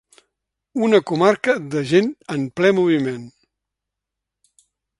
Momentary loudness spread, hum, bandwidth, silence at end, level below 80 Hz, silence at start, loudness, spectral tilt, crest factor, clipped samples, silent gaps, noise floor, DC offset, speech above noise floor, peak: 10 LU; none; 11.5 kHz; 1.7 s; -64 dBFS; 0.75 s; -19 LUFS; -6 dB/octave; 20 dB; under 0.1%; none; -83 dBFS; under 0.1%; 66 dB; 0 dBFS